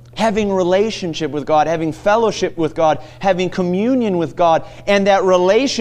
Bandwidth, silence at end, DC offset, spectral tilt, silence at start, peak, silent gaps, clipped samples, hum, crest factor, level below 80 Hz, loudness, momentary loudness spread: 11 kHz; 0 s; under 0.1%; -5.5 dB/octave; 0.15 s; -2 dBFS; none; under 0.1%; none; 14 dB; -46 dBFS; -16 LUFS; 7 LU